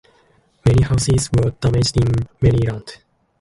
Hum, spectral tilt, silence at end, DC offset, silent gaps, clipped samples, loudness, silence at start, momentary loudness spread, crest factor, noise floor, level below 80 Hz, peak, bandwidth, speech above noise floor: none; -6 dB/octave; 0.45 s; under 0.1%; none; under 0.1%; -17 LUFS; 0.65 s; 6 LU; 14 dB; -57 dBFS; -32 dBFS; -4 dBFS; 11.5 kHz; 40 dB